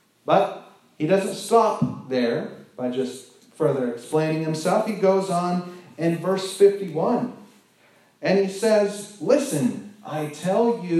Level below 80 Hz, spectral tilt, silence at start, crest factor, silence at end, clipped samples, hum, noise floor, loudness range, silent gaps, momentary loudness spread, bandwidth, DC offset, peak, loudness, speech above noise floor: -76 dBFS; -6 dB/octave; 0.25 s; 18 dB; 0 s; under 0.1%; none; -57 dBFS; 2 LU; none; 11 LU; 14 kHz; under 0.1%; -4 dBFS; -23 LUFS; 36 dB